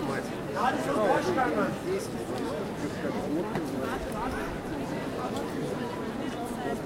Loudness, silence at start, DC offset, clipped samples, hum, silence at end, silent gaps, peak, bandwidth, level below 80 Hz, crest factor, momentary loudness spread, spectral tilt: -31 LUFS; 0 s; under 0.1%; under 0.1%; none; 0 s; none; -14 dBFS; 16 kHz; -50 dBFS; 16 dB; 8 LU; -5.5 dB/octave